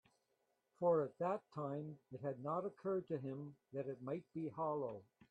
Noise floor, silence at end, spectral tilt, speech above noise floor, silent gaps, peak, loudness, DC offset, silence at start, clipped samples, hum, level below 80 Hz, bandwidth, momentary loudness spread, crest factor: -84 dBFS; 0.25 s; -10 dB/octave; 41 dB; none; -24 dBFS; -43 LUFS; under 0.1%; 0.8 s; under 0.1%; none; -86 dBFS; 8 kHz; 11 LU; 18 dB